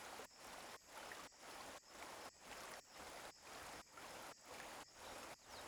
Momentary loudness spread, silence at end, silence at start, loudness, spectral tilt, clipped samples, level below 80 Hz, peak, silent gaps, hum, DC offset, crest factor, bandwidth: 2 LU; 0 s; 0 s; -55 LUFS; -1.5 dB/octave; under 0.1%; -78 dBFS; -38 dBFS; none; none; under 0.1%; 18 dB; over 20 kHz